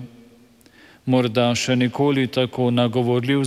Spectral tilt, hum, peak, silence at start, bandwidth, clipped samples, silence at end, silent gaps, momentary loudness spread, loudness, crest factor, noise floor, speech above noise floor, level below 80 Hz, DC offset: -5.5 dB/octave; none; -6 dBFS; 0 s; 13.5 kHz; under 0.1%; 0 s; none; 3 LU; -20 LUFS; 16 dB; -51 dBFS; 32 dB; -62 dBFS; under 0.1%